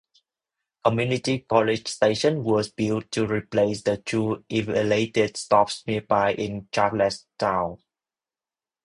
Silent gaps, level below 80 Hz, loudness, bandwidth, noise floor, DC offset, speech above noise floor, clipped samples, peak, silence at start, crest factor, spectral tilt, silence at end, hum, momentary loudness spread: none; -56 dBFS; -24 LUFS; 11 kHz; under -90 dBFS; under 0.1%; over 67 dB; under 0.1%; -4 dBFS; 0.85 s; 20 dB; -5.5 dB/octave; 1.1 s; none; 6 LU